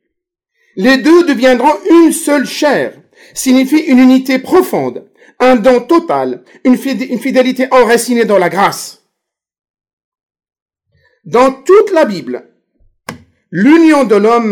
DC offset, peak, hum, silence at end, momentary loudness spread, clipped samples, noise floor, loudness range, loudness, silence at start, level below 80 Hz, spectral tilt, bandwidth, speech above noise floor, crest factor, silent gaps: under 0.1%; 0 dBFS; none; 0 s; 15 LU; under 0.1%; -76 dBFS; 5 LU; -10 LUFS; 0.75 s; -50 dBFS; -4.5 dB/octave; 18 kHz; 66 dB; 10 dB; 9.70-9.74 s, 9.93-9.97 s, 10.04-10.12 s, 10.23-10.29 s, 10.62-10.66 s